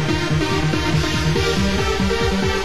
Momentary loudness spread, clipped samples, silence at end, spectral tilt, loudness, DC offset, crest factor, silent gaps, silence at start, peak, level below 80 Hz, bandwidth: 1 LU; under 0.1%; 0 s; -5 dB/octave; -19 LUFS; 3%; 12 dB; none; 0 s; -6 dBFS; -28 dBFS; 16 kHz